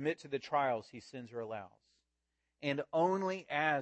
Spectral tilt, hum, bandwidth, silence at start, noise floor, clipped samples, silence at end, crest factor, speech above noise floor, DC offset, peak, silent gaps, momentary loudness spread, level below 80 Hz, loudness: -6 dB/octave; none; 8.4 kHz; 0 s; -86 dBFS; under 0.1%; 0 s; 20 dB; 50 dB; under 0.1%; -18 dBFS; none; 14 LU; -82 dBFS; -36 LUFS